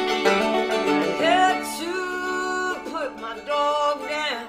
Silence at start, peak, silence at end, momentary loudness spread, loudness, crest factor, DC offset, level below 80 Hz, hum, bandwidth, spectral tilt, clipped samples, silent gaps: 0 s; -4 dBFS; 0 s; 9 LU; -23 LUFS; 18 dB; under 0.1%; -58 dBFS; none; 16.5 kHz; -3 dB/octave; under 0.1%; none